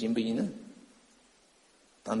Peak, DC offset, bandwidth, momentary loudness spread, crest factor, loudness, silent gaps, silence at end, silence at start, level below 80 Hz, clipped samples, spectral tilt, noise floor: -16 dBFS; under 0.1%; 11 kHz; 23 LU; 20 dB; -33 LUFS; none; 0 s; 0 s; -72 dBFS; under 0.1%; -6 dB/octave; -64 dBFS